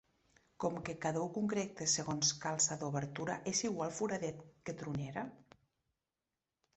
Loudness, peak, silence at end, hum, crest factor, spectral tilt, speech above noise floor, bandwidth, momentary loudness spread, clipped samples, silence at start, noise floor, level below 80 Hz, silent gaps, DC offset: -37 LUFS; -20 dBFS; 1.35 s; none; 20 dB; -3.5 dB/octave; over 52 dB; 8.2 kHz; 11 LU; under 0.1%; 0.6 s; under -90 dBFS; -72 dBFS; none; under 0.1%